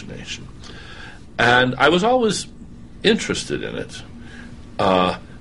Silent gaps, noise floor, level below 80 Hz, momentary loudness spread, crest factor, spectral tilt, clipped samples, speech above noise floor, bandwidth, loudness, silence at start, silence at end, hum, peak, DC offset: none; -40 dBFS; -44 dBFS; 23 LU; 18 dB; -4 dB/octave; under 0.1%; 21 dB; 11.5 kHz; -18 LUFS; 0 s; 0 s; none; -2 dBFS; 0.6%